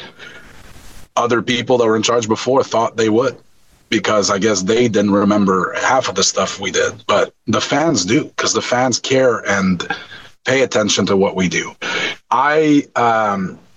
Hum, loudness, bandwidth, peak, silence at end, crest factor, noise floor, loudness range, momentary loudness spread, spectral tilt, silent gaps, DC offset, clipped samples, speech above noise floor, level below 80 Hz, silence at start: none; -16 LUFS; 9 kHz; -4 dBFS; 0.2 s; 12 dB; -40 dBFS; 2 LU; 6 LU; -4 dB/octave; none; 0.1%; under 0.1%; 24 dB; -54 dBFS; 0 s